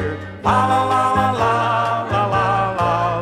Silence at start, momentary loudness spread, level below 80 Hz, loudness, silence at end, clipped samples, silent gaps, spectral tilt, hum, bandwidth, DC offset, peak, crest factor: 0 s; 3 LU; -44 dBFS; -18 LUFS; 0 s; under 0.1%; none; -6 dB/octave; none; 14.5 kHz; under 0.1%; -2 dBFS; 16 dB